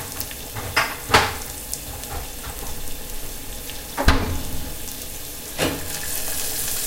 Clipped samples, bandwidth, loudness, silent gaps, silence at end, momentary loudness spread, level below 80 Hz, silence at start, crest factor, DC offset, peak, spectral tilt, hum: under 0.1%; 17 kHz; -25 LUFS; none; 0 s; 13 LU; -32 dBFS; 0 s; 24 dB; under 0.1%; 0 dBFS; -2.5 dB/octave; none